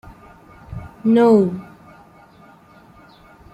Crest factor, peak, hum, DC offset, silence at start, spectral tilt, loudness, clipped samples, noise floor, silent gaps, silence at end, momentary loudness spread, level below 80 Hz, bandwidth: 18 dB; -2 dBFS; none; under 0.1%; 0.7 s; -8.5 dB/octave; -16 LUFS; under 0.1%; -48 dBFS; none; 1.9 s; 23 LU; -50 dBFS; 8.8 kHz